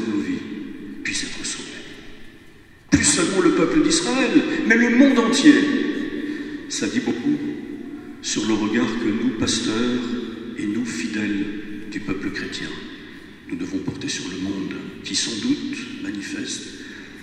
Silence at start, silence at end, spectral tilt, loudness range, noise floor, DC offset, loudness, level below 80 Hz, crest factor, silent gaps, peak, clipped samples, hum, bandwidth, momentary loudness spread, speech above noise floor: 0 s; 0 s; -3.5 dB/octave; 11 LU; -46 dBFS; under 0.1%; -21 LUFS; -48 dBFS; 22 dB; none; 0 dBFS; under 0.1%; none; 11 kHz; 17 LU; 25 dB